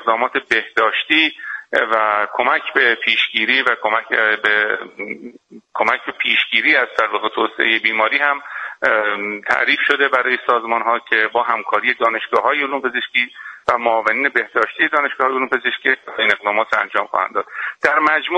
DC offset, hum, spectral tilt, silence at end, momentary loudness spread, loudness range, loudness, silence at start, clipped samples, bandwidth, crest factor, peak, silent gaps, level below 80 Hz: under 0.1%; none; -3 dB/octave; 0 s; 6 LU; 2 LU; -16 LUFS; 0 s; under 0.1%; 10.5 kHz; 18 dB; 0 dBFS; none; -62 dBFS